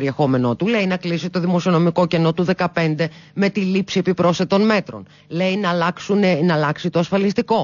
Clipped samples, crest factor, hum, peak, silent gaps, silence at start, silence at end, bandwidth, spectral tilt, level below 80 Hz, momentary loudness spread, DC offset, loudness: under 0.1%; 12 dB; none; -6 dBFS; none; 0 s; 0 s; 7.2 kHz; -6.5 dB/octave; -56 dBFS; 6 LU; under 0.1%; -19 LUFS